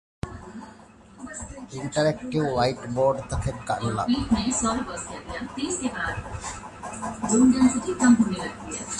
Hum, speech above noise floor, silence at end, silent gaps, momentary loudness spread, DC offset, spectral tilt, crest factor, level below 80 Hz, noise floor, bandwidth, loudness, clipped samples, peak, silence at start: none; 25 dB; 0 s; none; 18 LU; under 0.1%; -5 dB/octave; 18 dB; -44 dBFS; -49 dBFS; 11.5 kHz; -25 LUFS; under 0.1%; -8 dBFS; 0.25 s